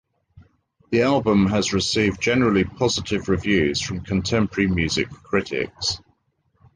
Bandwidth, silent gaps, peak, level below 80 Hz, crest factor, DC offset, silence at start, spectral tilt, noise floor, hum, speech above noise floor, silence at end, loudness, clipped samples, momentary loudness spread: 10 kHz; none; -6 dBFS; -42 dBFS; 16 dB; under 0.1%; 0.35 s; -5 dB/octave; -67 dBFS; none; 46 dB; 0.8 s; -21 LUFS; under 0.1%; 6 LU